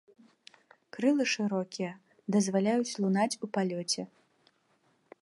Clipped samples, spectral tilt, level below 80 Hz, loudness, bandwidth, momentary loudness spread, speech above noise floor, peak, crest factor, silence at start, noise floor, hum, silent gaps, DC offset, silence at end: under 0.1%; -4.5 dB/octave; -82 dBFS; -30 LUFS; 11.5 kHz; 11 LU; 41 dB; -14 dBFS; 18 dB; 0.95 s; -71 dBFS; none; none; under 0.1%; 1.15 s